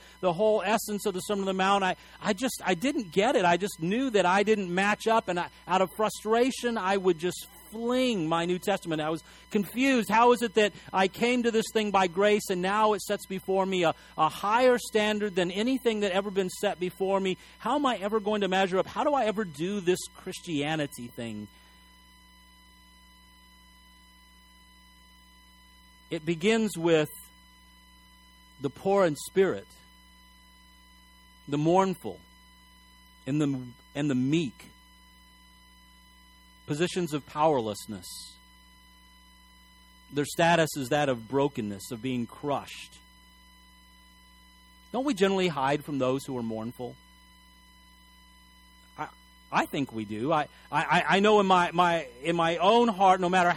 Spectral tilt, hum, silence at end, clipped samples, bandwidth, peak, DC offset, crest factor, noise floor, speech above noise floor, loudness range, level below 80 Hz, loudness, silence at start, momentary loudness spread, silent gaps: -5 dB/octave; none; 0 s; under 0.1%; 18 kHz; -10 dBFS; under 0.1%; 18 dB; -56 dBFS; 29 dB; 9 LU; -60 dBFS; -27 LUFS; 0.2 s; 13 LU; none